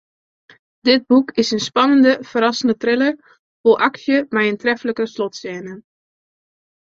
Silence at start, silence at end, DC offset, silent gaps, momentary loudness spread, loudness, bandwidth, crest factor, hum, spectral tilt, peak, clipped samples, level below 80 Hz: 0.85 s; 1.05 s; under 0.1%; 3.39-3.64 s; 12 LU; -17 LUFS; 7.6 kHz; 16 dB; none; -4 dB/octave; -2 dBFS; under 0.1%; -64 dBFS